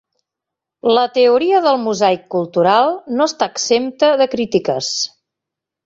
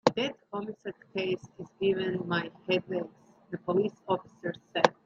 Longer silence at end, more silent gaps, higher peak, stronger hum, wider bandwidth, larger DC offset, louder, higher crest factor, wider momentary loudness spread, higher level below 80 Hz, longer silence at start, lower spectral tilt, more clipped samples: first, 0.8 s vs 0.15 s; neither; about the same, -2 dBFS vs -2 dBFS; neither; about the same, 7.8 kHz vs 7.6 kHz; neither; first, -15 LUFS vs -32 LUFS; second, 16 dB vs 28 dB; second, 7 LU vs 11 LU; first, -62 dBFS vs -70 dBFS; first, 0.85 s vs 0.05 s; second, -3.5 dB/octave vs -5.5 dB/octave; neither